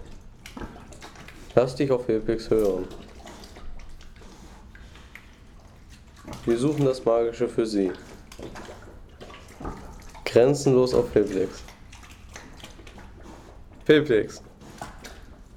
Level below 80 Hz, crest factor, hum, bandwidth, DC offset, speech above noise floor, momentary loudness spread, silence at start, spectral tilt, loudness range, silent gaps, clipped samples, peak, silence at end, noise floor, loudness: -46 dBFS; 20 dB; none; 16 kHz; under 0.1%; 26 dB; 26 LU; 0 s; -6 dB/octave; 8 LU; none; under 0.1%; -6 dBFS; 0 s; -48 dBFS; -23 LUFS